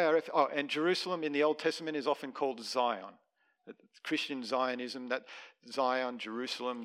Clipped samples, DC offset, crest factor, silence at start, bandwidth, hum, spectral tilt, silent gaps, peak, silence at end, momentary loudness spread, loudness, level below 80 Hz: under 0.1%; under 0.1%; 20 dB; 0 s; 14.5 kHz; none; -4 dB/octave; none; -14 dBFS; 0 s; 9 LU; -34 LUFS; under -90 dBFS